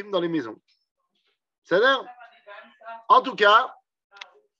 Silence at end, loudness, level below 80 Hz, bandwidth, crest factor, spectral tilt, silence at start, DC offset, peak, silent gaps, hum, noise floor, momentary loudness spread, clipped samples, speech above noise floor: 0.9 s; -21 LUFS; -86 dBFS; 7.6 kHz; 22 dB; -4.5 dB/octave; 0 s; under 0.1%; -4 dBFS; 0.91-0.95 s, 1.58-1.62 s; none; -74 dBFS; 24 LU; under 0.1%; 52 dB